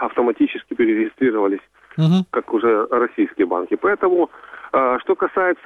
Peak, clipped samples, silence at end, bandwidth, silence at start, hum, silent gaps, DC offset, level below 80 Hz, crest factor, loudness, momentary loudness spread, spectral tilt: -4 dBFS; under 0.1%; 0.1 s; 6.6 kHz; 0 s; none; none; under 0.1%; -62 dBFS; 14 dB; -19 LUFS; 5 LU; -8.5 dB/octave